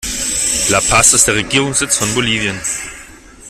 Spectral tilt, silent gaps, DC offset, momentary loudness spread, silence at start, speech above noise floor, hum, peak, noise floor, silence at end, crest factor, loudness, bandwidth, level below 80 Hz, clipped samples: -1.5 dB/octave; none; under 0.1%; 12 LU; 0 s; 23 dB; none; 0 dBFS; -37 dBFS; 0 s; 16 dB; -12 LUFS; over 20 kHz; -36 dBFS; under 0.1%